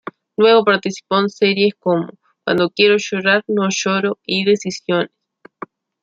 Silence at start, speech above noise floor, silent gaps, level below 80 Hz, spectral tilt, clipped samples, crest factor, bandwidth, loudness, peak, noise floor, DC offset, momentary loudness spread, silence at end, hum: 0.4 s; 21 dB; none; -66 dBFS; -4.5 dB/octave; under 0.1%; 16 dB; 7.8 kHz; -16 LUFS; -2 dBFS; -37 dBFS; under 0.1%; 15 LU; 0.95 s; none